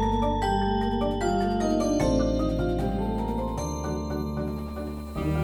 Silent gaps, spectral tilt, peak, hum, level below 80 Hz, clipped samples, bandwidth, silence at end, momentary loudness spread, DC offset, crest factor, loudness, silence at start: none; -6.5 dB/octave; -12 dBFS; none; -34 dBFS; under 0.1%; 19.5 kHz; 0 s; 7 LU; under 0.1%; 14 dB; -27 LUFS; 0 s